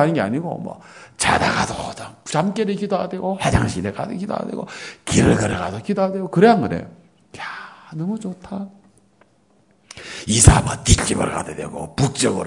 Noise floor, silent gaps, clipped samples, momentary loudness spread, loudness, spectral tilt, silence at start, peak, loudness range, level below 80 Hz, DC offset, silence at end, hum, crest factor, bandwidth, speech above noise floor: -58 dBFS; none; under 0.1%; 18 LU; -19 LUFS; -4.5 dB/octave; 0 s; 0 dBFS; 6 LU; -32 dBFS; under 0.1%; 0 s; none; 20 dB; 12 kHz; 38 dB